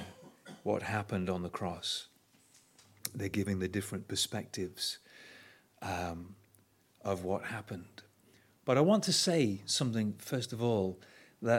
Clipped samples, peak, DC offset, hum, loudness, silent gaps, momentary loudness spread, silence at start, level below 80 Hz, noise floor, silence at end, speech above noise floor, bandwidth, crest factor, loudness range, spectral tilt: under 0.1%; -10 dBFS; under 0.1%; none; -34 LUFS; none; 21 LU; 0 s; -68 dBFS; -67 dBFS; 0 s; 34 dB; 17 kHz; 26 dB; 9 LU; -4.5 dB/octave